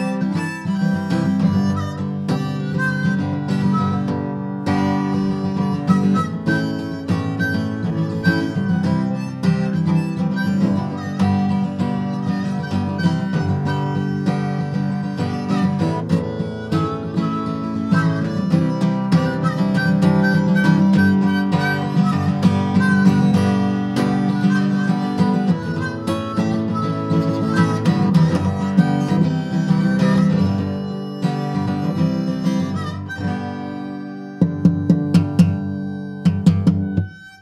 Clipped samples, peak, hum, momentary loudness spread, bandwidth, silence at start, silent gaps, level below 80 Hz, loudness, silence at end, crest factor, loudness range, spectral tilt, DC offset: under 0.1%; -2 dBFS; none; 8 LU; 11.5 kHz; 0 s; none; -52 dBFS; -19 LUFS; 0.05 s; 16 dB; 5 LU; -8 dB/octave; under 0.1%